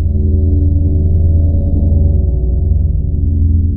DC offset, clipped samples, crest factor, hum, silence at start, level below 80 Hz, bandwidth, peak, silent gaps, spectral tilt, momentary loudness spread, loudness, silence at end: under 0.1%; under 0.1%; 8 dB; none; 0 s; -14 dBFS; 0.9 kHz; -2 dBFS; none; -15.5 dB/octave; 3 LU; -13 LUFS; 0 s